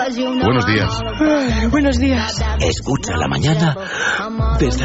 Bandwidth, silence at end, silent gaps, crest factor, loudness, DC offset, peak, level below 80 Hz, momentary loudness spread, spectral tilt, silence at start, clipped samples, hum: 8 kHz; 0 s; none; 12 dB; -17 LUFS; under 0.1%; -4 dBFS; -24 dBFS; 4 LU; -5 dB/octave; 0 s; under 0.1%; none